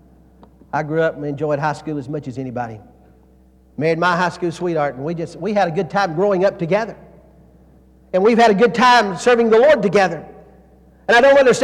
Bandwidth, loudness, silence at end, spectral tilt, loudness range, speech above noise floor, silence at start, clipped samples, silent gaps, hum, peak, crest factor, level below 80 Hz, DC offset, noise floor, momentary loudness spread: 11.5 kHz; -17 LUFS; 0 s; -5.5 dB/octave; 9 LU; 34 dB; 0.75 s; under 0.1%; none; none; -2 dBFS; 14 dB; -52 dBFS; under 0.1%; -50 dBFS; 15 LU